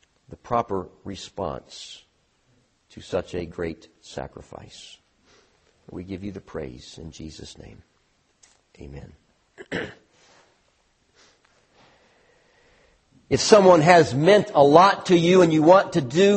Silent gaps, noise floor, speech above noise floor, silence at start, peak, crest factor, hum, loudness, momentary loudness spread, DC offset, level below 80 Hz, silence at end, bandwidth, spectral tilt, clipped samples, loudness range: none; -66 dBFS; 46 dB; 0.5 s; 0 dBFS; 22 dB; none; -19 LUFS; 27 LU; under 0.1%; -54 dBFS; 0 s; 8.8 kHz; -5.5 dB/octave; under 0.1%; 23 LU